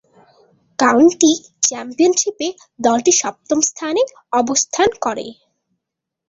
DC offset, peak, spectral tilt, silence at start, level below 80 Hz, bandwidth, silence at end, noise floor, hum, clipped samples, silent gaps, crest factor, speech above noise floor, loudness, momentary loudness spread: under 0.1%; 0 dBFS; -1.5 dB/octave; 0.8 s; -58 dBFS; 7.8 kHz; 0.95 s; -81 dBFS; none; under 0.1%; none; 18 dB; 65 dB; -16 LUFS; 12 LU